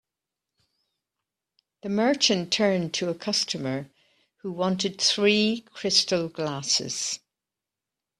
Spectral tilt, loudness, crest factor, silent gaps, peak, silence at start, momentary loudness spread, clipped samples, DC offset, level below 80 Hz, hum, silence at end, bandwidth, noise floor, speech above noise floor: -3 dB/octave; -24 LUFS; 20 dB; none; -8 dBFS; 1.85 s; 10 LU; under 0.1%; under 0.1%; -68 dBFS; none; 1 s; 13.5 kHz; -88 dBFS; 63 dB